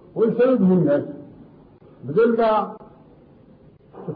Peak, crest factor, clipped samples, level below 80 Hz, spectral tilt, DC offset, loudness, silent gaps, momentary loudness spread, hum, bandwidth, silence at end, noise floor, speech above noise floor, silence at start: -10 dBFS; 12 dB; under 0.1%; -60 dBFS; -11.5 dB/octave; under 0.1%; -19 LUFS; none; 21 LU; none; 5 kHz; 0 s; -50 dBFS; 32 dB; 0.15 s